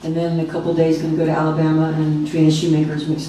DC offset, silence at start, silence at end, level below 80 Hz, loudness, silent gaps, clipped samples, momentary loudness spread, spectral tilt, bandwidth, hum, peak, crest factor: under 0.1%; 0 s; 0 s; -50 dBFS; -18 LUFS; none; under 0.1%; 5 LU; -7 dB/octave; 11 kHz; none; -4 dBFS; 14 dB